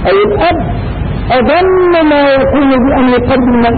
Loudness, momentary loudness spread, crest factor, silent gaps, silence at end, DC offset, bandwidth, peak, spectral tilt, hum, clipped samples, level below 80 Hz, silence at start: -9 LUFS; 8 LU; 6 dB; none; 0 s; under 0.1%; 4.7 kHz; -2 dBFS; -12.5 dB/octave; none; under 0.1%; -24 dBFS; 0 s